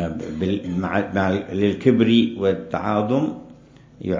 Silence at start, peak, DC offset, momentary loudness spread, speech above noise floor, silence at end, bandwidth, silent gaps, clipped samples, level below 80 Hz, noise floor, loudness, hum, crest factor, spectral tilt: 0 s; -2 dBFS; under 0.1%; 10 LU; 26 dB; 0 s; 7.6 kHz; none; under 0.1%; -46 dBFS; -47 dBFS; -21 LUFS; none; 18 dB; -7.5 dB/octave